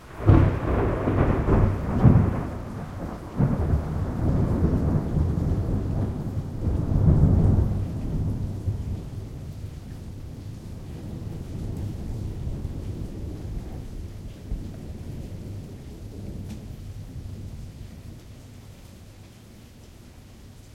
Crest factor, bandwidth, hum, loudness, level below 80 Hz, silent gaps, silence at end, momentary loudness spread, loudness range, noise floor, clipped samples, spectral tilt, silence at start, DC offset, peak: 22 dB; 12 kHz; none; -26 LUFS; -32 dBFS; none; 0 s; 21 LU; 16 LU; -47 dBFS; under 0.1%; -9 dB/octave; 0 s; under 0.1%; -4 dBFS